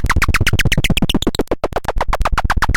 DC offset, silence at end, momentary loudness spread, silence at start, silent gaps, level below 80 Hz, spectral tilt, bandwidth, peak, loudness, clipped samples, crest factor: under 0.1%; 0 s; 6 LU; 0 s; none; -18 dBFS; -4.5 dB/octave; 17 kHz; -4 dBFS; -17 LUFS; under 0.1%; 12 dB